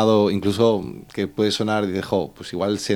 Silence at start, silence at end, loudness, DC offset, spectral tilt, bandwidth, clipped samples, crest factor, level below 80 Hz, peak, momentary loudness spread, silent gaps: 0 s; 0 s; -22 LUFS; under 0.1%; -5.5 dB/octave; 19 kHz; under 0.1%; 16 dB; -56 dBFS; -4 dBFS; 9 LU; none